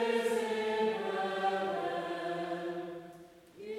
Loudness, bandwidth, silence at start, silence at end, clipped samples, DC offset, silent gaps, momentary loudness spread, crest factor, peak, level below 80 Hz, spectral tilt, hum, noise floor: -34 LUFS; 15.5 kHz; 0 s; 0 s; under 0.1%; under 0.1%; none; 16 LU; 16 dB; -20 dBFS; -78 dBFS; -4.5 dB/octave; none; -54 dBFS